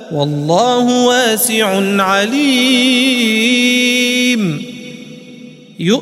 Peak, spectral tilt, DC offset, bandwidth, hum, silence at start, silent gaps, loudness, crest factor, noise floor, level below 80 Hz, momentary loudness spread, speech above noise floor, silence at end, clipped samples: 0 dBFS; -3.5 dB/octave; under 0.1%; 16 kHz; none; 0 s; none; -12 LUFS; 14 dB; -35 dBFS; -62 dBFS; 10 LU; 23 dB; 0 s; under 0.1%